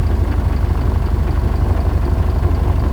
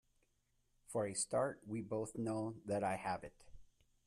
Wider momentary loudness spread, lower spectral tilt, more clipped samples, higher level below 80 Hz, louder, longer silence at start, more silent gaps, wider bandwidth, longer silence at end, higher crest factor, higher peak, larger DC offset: second, 1 LU vs 8 LU; first, -8.5 dB/octave vs -5 dB/octave; neither; first, -16 dBFS vs -70 dBFS; first, -18 LUFS vs -41 LUFS; second, 0 s vs 0.9 s; neither; second, 11.5 kHz vs 14 kHz; second, 0 s vs 0.4 s; second, 10 dB vs 18 dB; first, -4 dBFS vs -24 dBFS; neither